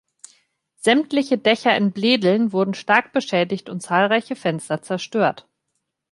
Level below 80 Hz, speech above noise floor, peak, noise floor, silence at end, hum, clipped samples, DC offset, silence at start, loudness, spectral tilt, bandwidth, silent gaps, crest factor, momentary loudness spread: -70 dBFS; 56 dB; -2 dBFS; -76 dBFS; 0.7 s; none; under 0.1%; under 0.1%; 0.85 s; -20 LUFS; -5 dB/octave; 11.5 kHz; none; 18 dB; 8 LU